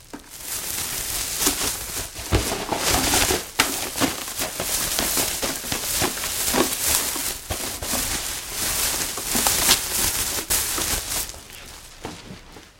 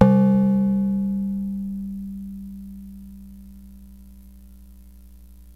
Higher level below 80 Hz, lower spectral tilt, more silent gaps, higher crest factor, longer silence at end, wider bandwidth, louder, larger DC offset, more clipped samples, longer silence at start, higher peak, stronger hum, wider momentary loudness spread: first, -40 dBFS vs -46 dBFS; second, -1.5 dB/octave vs -10.5 dB/octave; neither; about the same, 24 dB vs 22 dB; about the same, 0.1 s vs 0.05 s; first, 17 kHz vs 3 kHz; about the same, -22 LUFS vs -22 LUFS; second, under 0.1% vs 0.2%; neither; about the same, 0 s vs 0 s; about the same, 0 dBFS vs 0 dBFS; second, none vs 60 Hz at -45 dBFS; second, 15 LU vs 26 LU